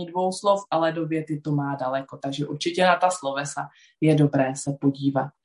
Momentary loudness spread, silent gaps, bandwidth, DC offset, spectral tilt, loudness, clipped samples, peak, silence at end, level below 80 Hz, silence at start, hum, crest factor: 10 LU; none; 11.5 kHz; under 0.1%; -5.5 dB/octave; -24 LUFS; under 0.1%; -6 dBFS; 0.15 s; -68 dBFS; 0 s; none; 18 dB